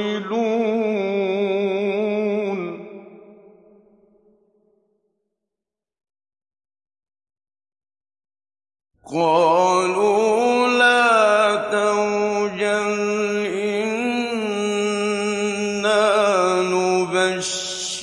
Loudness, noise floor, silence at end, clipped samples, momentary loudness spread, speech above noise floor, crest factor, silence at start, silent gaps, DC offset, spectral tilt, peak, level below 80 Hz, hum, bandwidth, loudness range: -19 LUFS; -87 dBFS; 0 s; under 0.1%; 8 LU; 69 dB; 16 dB; 0 s; none; under 0.1%; -3.5 dB/octave; -4 dBFS; -66 dBFS; none; 11.5 kHz; 11 LU